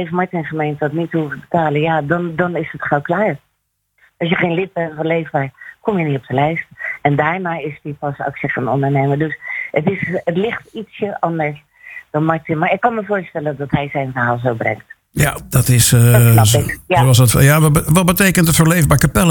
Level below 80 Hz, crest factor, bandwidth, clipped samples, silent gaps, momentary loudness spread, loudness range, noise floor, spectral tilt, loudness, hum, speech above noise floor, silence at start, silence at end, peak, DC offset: -36 dBFS; 16 dB; 19.5 kHz; under 0.1%; none; 13 LU; 8 LU; -69 dBFS; -5 dB/octave; -16 LUFS; none; 54 dB; 0 s; 0 s; 0 dBFS; under 0.1%